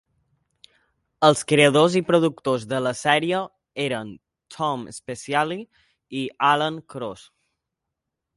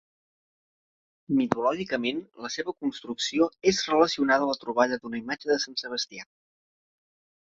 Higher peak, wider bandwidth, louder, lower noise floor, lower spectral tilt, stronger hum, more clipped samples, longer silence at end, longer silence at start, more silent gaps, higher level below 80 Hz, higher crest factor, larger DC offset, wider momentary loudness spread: first, -2 dBFS vs -6 dBFS; first, 11.5 kHz vs 7.8 kHz; first, -22 LUFS vs -27 LUFS; second, -83 dBFS vs under -90 dBFS; about the same, -4.5 dB/octave vs -3.5 dB/octave; neither; neither; about the same, 1.2 s vs 1.25 s; about the same, 1.2 s vs 1.3 s; neither; about the same, -64 dBFS vs -66 dBFS; about the same, 22 dB vs 24 dB; neither; first, 17 LU vs 10 LU